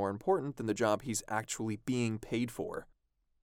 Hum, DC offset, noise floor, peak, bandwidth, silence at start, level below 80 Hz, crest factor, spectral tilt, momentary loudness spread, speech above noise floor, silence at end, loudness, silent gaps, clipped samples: none; under 0.1%; -77 dBFS; -16 dBFS; 17.5 kHz; 0 s; -62 dBFS; 18 dB; -5 dB/octave; 7 LU; 43 dB; 0.6 s; -35 LUFS; none; under 0.1%